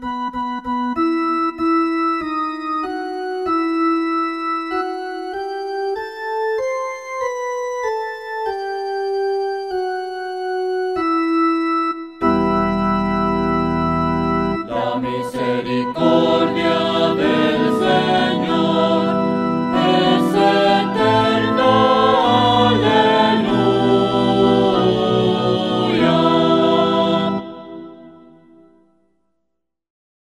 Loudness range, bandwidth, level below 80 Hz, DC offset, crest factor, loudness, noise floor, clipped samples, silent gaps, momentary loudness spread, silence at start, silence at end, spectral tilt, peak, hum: 9 LU; 12 kHz; -46 dBFS; 0.1%; 16 dB; -18 LUFS; -76 dBFS; under 0.1%; none; 10 LU; 0 s; 2.15 s; -6.5 dB/octave; -2 dBFS; none